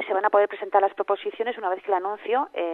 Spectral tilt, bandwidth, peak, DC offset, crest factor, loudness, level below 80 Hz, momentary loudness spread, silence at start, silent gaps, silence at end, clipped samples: -5.5 dB/octave; 4.2 kHz; -6 dBFS; under 0.1%; 18 dB; -24 LUFS; -78 dBFS; 6 LU; 0 s; none; 0 s; under 0.1%